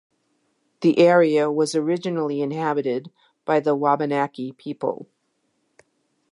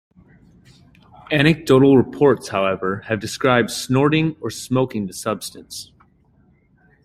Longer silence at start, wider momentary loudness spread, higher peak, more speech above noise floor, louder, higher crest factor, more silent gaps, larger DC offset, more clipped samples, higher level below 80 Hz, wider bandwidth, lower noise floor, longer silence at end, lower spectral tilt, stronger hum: second, 0.8 s vs 1.3 s; about the same, 14 LU vs 14 LU; about the same, -4 dBFS vs -2 dBFS; first, 50 dB vs 38 dB; second, -21 LUFS vs -18 LUFS; about the same, 18 dB vs 18 dB; neither; neither; neither; second, -78 dBFS vs -52 dBFS; second, 11 kHz vs 16 kHz; first, -71 dBFS vs -57 dBFS; about the same, 1.25 s vs 1.2 s; about the same, -6 dB/octave vs -5.5 dB/octave; neither